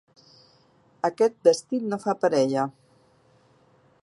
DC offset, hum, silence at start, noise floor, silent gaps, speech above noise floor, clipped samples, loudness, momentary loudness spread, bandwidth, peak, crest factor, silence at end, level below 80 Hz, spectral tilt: under 0.1%; none; 1.05 s; -60 dBFS; none; 37 dB; under 0.1%; -24 LUFS; 9 LU; 11.5 kHz; -6 dBFS; 22 dB; 1.35 s; -76 dBFS; -5 dB/octave